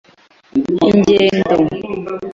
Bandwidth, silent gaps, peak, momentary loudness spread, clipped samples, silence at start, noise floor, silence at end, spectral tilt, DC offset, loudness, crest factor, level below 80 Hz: 7.6 kHz; none; -2 dBFS; 13 LU; under 0.1%; 0.55 s; -48 dBFS; 0 s; -6.5 dB/octave; under 0.1%; -15 LUFS; 14 dB; -46 dBFS